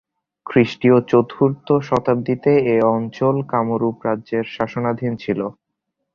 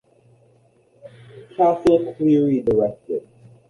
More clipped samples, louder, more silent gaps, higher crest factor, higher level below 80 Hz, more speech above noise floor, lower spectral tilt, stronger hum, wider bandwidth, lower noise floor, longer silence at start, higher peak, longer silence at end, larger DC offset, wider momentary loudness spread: neither; about the same, -19 LUFS vs -19 LUFS; neither; about the same, 18 dB vs 18 dB; about the same, -56 dBFS vs -54 dBFS; first, 59 dB vs 39 dB; about the same, -8.5 dB/octave vs -8.5 dB/octave; neither; second, 7 kHz vs 11 kHz; first, -77 dBFS vs -57 dBFS; second, 0.45 s vs 1.05 s; about the same, -2 dBFS vs -4 dBFS; first, 0.65 s vs 0.5 s; neither; second, 9 LU vs 13 LU